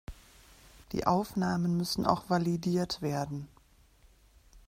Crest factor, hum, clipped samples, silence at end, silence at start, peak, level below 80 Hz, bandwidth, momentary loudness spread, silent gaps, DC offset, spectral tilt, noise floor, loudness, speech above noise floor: 22 dB; none; under 0.1%; 0.1 s; 0.1 s; -10 dBFS; -56 dBFS; 16 kHz; 10 LU; none; under 0.1%; -6 dB/octave; -62 dBFS; -31 LUFS; 32 dB